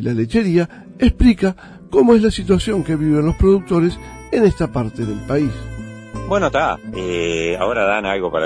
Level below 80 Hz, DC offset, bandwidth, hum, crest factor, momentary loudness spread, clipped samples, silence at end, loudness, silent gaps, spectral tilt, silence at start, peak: -30 dBFS; under 0.1%; 10.5 kHz; none; 16 dB; 11 LU; under 0.1%; 0 s; -17 LUFS; none; -7 dB/octave; 0 s; -2 dBFS